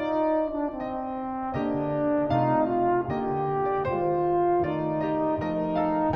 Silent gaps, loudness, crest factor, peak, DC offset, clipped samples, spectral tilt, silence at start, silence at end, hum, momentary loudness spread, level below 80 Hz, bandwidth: none; -26 LUFS; 14 dB; -12 dBFS; under 0.1%; under 0.1%; -10 dB/octave; 0 s; 0 s; none; 7 LU; -52 dBFS; 5.8 kHz